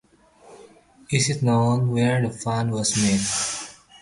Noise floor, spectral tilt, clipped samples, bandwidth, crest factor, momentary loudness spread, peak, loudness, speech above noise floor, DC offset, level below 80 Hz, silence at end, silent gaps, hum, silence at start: -52 dBFS; -4.5 dB/octave; under 0.1%; 11.5 kHz; 16 dB; 6 LU; -8 dBFS; -22 LUFS; 31 dB; under 0.1%; -52 dBFS; 0.05 s; none; none; 0.5 s